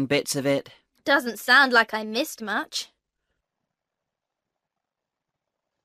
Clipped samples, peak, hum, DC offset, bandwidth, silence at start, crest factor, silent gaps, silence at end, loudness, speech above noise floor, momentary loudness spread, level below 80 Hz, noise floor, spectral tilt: under 0.1%; -6 dBFS; none; under 0.1%; 15.5 kHz; 0 s; 22 dB; none; 3 s; -22 LUFS; 62 dB; 15 LU; -72 dBFS; -85 dBFS; -3 dB/octave